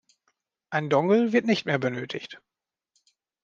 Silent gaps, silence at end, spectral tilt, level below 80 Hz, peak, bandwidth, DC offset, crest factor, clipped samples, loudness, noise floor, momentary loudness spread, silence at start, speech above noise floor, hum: none; 1.05 s; -6.5 dB/octave; -76 dBFS; -8 dBFS; 7.4 kHz; under 0.1%; 20 dB; under 0.1%; -25 LUFS; -75 dBFS; 14 LU; 0.7 s; 51 dB; none